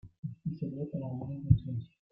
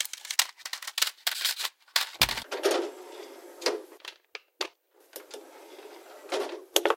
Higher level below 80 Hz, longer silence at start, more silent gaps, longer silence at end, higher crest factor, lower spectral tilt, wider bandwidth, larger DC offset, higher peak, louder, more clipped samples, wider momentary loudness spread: first, -50 dBFS vs -60 dBFS; about the same, 0.05 s vs 0 s; first, 0.19-0.23 s vs none; first, 0.25 s vs 0 s; second, 24 dB vs 32 dB; first, -13 dB/octave vs -0.5 dB/octave; second, 3.9 kHz vs 17 kHz; neither; second, -10 dBFS vs 0 dBFS; second, -34 LUFS vs -29 LUFS; neither; second, 12 LU vs 21 LU